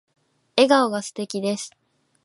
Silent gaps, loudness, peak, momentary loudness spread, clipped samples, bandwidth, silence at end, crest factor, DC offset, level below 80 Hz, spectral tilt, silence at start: none; -22 LUFS; -2 dBFS; 13 LU; under 0.1%; 11.5 kHz; 0.55 s; 22 dB; under 0.1%; -76 dBFS; -3.5 dB/octave; 0.55 s